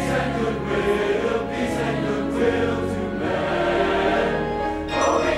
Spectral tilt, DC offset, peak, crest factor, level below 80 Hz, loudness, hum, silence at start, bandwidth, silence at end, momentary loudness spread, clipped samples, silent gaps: -5.5 dB/octave; under 0.1%; -6 dBFS; 16 dB; -40 dBFS; -22 LUFS; none; 0 s; 15 kHz; 0 s; 5 LU; under 0.1%; none